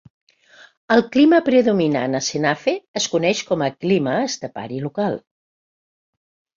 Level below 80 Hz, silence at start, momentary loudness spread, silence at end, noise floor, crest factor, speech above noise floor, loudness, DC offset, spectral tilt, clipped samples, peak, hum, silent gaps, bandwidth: -62 dBFS; 0.9 s; 12 LU; 1.4 s; -50 dBFS; 18 dB; 31 dB; -19 LUFS; under 0.1%; -4.5 dB/octave; under 0.1%; -2 dBFS; none; 2.88-2.94 s; 7.6 kHz